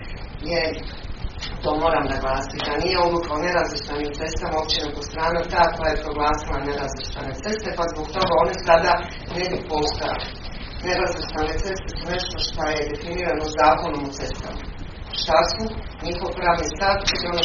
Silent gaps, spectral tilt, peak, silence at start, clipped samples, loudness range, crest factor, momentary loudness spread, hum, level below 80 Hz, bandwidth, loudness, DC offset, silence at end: none; -2.5 dB/octave; 0 dBFS; 0 s; under 0.1%; 3 LU; 22 dB; 12 LU; none; -34 dBFS; 7.2 kHz; -23 LUFS; under 0.1%; 0 s